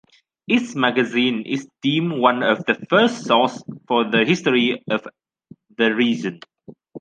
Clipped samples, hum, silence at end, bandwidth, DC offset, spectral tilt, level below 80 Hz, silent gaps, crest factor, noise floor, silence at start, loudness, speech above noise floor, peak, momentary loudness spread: under 0.1%; none; 0 s; 9.2 kHz; under 0.1%; -5 dB/octave; -70 dBFS; none; 18 dB; -49 dBFS; 0.5 s; -19 LUFS; 30 dB; -2 dBFS; 8 LU